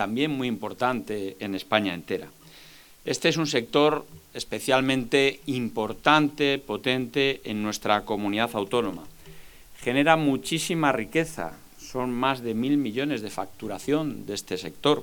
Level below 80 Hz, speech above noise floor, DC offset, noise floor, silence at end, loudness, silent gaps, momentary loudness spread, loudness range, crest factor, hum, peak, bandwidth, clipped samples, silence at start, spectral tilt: -56 dBFS; 24 dB; under 0.1%; -50 dBFS; 0 s; -26 LUFS; none; 12 LU; 4 LU; 24 dB; none; -2 dBFS; 19.5 kHz; under 0.1%; 0 s; -4.5 dB/octave